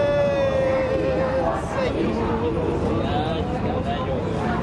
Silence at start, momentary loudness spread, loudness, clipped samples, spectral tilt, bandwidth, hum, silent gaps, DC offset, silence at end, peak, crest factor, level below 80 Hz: 0 s; 4 LU; -23 LUFS; under 0.1%; -7.5 dB/octave; 11 kHz; none; none; under 0.1%; 0 s; -10 dBFS; 12 dB; -36 dBFS